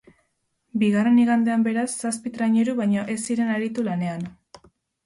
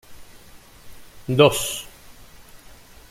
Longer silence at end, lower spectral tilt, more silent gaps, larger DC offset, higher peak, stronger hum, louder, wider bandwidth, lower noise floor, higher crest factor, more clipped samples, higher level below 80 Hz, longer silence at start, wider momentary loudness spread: second, 0.75 s vs 1.25 s; first, -5.5 dB/octave vs -4 dB/octave; neither; neither; second, -10 dBFS vs -2 dBFS; neither; second, -22 LUFS vs -19 LUFS; second, 11.5 kHz vs 16.5 kHz; first, -72 dBFS vs -46 dBFS; second, 12 dB vs 24 dB; neither; second, -66 dBFS vs -50 dBFS; first, 0.75 s vs 0.1 s; second, 10 LU vs 22 LU